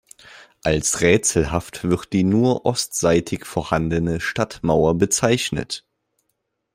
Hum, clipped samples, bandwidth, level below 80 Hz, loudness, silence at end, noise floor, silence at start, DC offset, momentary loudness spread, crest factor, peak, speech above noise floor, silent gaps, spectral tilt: none; under 0.1%; 16 kHz; -42 dBFS; -20 LUFS; 0.95 s; -74 dBFS; 0.3 s; under 0.1%; 9 LU; 18 dB; -2 dBFS; 55 dB; none; -4.5 dB/octave